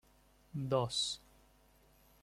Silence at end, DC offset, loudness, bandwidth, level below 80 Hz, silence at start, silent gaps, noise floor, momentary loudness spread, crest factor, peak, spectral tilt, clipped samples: 1.05 s; under 0.1%; -37 LUFS; 15.5 kHz; -68 dBFS; 0.55 s; none; -67 dBFS; 13 LU; 22 dB; -18 dBFS; -4.5 dB/octave; under 0.1%